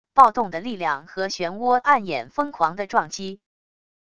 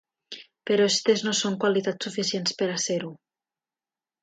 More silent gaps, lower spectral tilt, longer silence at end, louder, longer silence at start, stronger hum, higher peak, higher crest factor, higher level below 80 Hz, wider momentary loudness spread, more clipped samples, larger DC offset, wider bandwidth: neither; about the same, -4 dB/octave vs -3 dB/octave; second, 0.75 s vs 1.05 s; first, -22 LUFS vs -25 LUFS; second, 0.15 s vs 0.3 s; neither; first, 0 dBFS vs -8 dBFS; about the same, 22 dB vs 18 dB; first, -60 dBFS vs -74 dBFS; second, 12 LU vs 18 LU; neither; first, 0.5% vs under 0.1%; first, 11 kHz vs 9.4 kHz